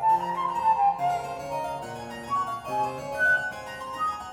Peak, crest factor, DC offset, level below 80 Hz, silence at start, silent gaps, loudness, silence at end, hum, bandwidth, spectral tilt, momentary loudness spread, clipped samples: -12 dBFS; 14 dB; under 0.1%; -58 dBFS; 0 s; none; -27 LUFS; 0 s; none; 18 kHz; -4 dB/octave; 13 LU; under 0.1%